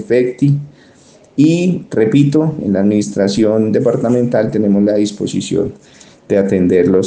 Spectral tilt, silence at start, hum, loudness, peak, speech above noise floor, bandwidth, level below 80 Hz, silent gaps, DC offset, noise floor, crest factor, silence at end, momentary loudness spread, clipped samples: -7 dB/octave; 0 s; none; -14 LUFS; 0 dBFS; 32 dB; 9.6 kHz; -52 dBFS; none; under 0.1%; -45 dBFS; 12 dB; 0 s; 6 LU; under 0.1%